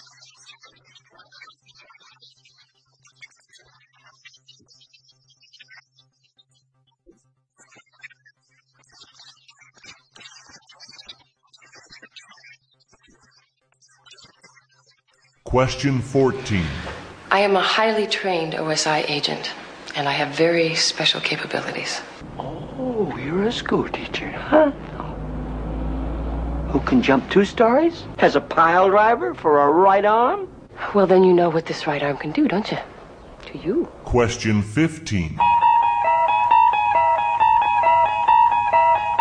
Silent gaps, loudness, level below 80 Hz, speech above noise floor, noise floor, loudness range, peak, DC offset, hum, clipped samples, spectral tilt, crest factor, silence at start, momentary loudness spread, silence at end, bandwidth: none; -19 LUFS; -40 dBFS; 46 dB; -65 dBFS; 7 LU; 0 dBFS; under 0.1%; none; under 0.1%; -5 dB/octave; 20 dB; 3.2 s; 15 LU; 0 s; 10.5 kHz